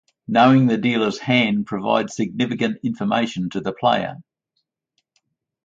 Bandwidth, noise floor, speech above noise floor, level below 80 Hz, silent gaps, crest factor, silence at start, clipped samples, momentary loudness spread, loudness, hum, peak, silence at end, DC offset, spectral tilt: 7.8 kHz; -75 dBFS; 56 dB; -60 dBFS; none; 18 dB; 0.3 s; under 0.1%; 10 LU; -20 LUFS; none; -2 dBFS; 1.45 s; under 0.1%; -6 dB/octave